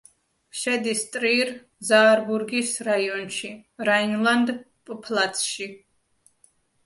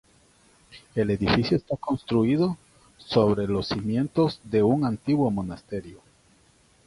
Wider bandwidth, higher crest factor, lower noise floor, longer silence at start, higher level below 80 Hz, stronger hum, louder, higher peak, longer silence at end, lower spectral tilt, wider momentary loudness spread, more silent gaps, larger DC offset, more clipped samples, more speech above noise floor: about the same, 12 kHz vs 11.5 kHz; about the same, 20 dB vs 18 dB; about the same, -63 dBFS vs -60 dBFS; second, 0.55 s vs 0.75 s; second, -72 dBFS vs -50 dBFS; neither; about the same, -23 LUFS vs -25 LUFS; about the same, -6 dBFS vs -6 dBFS; first, 1.1 s vs 0.9 s; second, -2.5 dB/octave vs -7.5 dB/octave; first, 17 LU vs 11 LU; neither; neither; neither; first, 40 dB vs 36 dB